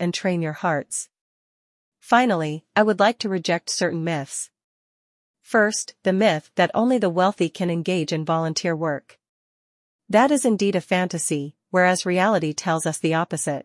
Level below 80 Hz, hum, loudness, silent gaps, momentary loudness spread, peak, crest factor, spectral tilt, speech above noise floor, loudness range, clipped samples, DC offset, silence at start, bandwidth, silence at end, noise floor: -70 dBFS; none; -22 LUFS; 1.21-1.92 s, 4.64-5.34 s, 9.29-9.99 s; 7 LU; -4 dBFS; 18 dB; -4.5 dB/octave; over 69 dB; 3 LU; under 0.1%; under 0.1%; 0 s; 12 kHz; 0 s; under -90 dBFS